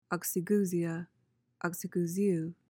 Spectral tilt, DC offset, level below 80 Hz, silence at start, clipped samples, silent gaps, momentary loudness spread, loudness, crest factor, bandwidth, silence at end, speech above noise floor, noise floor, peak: -6 dB/octave; under 0.1%; -80 dBFS; 0.1 s; under 0.1%; none; 9 LU; -33 LUFS; 16 dB; 18 kHz; 0.15 s; 29 dB; -61 dBFS; -18 dBFS